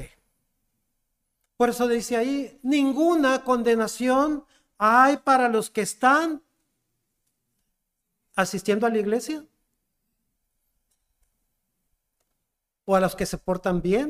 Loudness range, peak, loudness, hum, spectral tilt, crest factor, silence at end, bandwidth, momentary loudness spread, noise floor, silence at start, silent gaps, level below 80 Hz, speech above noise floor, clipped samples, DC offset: 10 LU; -6 dBFS; -23 LUFS; none; -5 dB/octave; 20 dB; 0 s; 15.5 kHz; 10 LU; -81 dBFS; 0 s; none; -54 dBFS; 59 dB; under 0.1%; under 0.1%